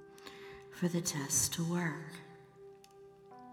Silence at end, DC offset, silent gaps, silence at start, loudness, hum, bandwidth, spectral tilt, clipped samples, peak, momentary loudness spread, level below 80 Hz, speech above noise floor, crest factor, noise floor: 0 s; under 0.1%; none; 0 s; -34 LUFS; none; 19.5 kHz; -3.5 dB/octave; under 0.1%; -20 dBFS; 25 LU; -68 dBFS; 23 dB; 20 dB; -58 dBFS